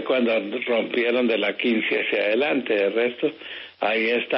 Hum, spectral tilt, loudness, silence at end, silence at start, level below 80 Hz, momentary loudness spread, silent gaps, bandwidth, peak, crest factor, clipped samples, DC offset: none; -1.5 dB/octave; -22 LUFS; 0 s; 0 s; -78 dBFS; 6 LU; none; 5.8 kHz; -10 dBFS; 12 dB; under 0.1%; under 0.1%